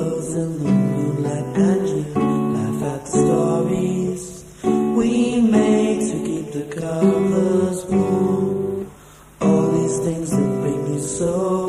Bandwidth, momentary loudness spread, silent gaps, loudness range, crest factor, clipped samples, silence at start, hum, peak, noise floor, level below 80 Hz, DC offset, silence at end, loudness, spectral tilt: 13 kHz; 8 LU; none; 2 LU; 14 dB; under 0.1%; 0 s; none; -4 dBFS; -44 dBFS; -48 dBFS; under 0.1%; 0 s; -20 LUFS; -7 dB/octave